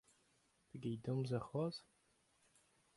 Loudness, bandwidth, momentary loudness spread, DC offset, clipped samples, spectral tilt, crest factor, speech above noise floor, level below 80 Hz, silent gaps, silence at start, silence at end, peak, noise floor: -44 LUFS; 11.5 kHz; 11 LU; under 0.1%; under 0.1%; -7.5 dB/octave; 18 dB; 35 dB; -78 dBFS; none; 0.75 s; 1.15 s; -28 dBFS; -78 dBFS